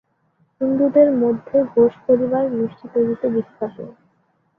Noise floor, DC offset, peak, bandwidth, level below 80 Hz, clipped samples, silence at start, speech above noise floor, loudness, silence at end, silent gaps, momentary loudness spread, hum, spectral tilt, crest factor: -64 dBFS; under 0.1%; -2 dBFS; 3.6 kHz; -62 dBFS; under 0.1%; 0.6 s; 46 dB; -19 LUFS; 0.7 s; none; 15 LU; none; -11 dB/octave; 16 dB